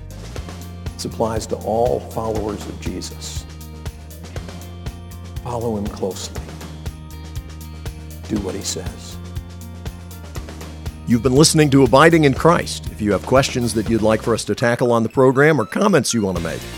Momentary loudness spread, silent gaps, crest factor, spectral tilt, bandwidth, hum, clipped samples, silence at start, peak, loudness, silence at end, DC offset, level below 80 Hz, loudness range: 20 LU; none; 20 dB; -5 dB/octave; 19 kHz; none; under 0.1%; 0 s; 0 dBFS; -18 LUFS; 0 s; under 0.1%; -36 dBFS; 14 LU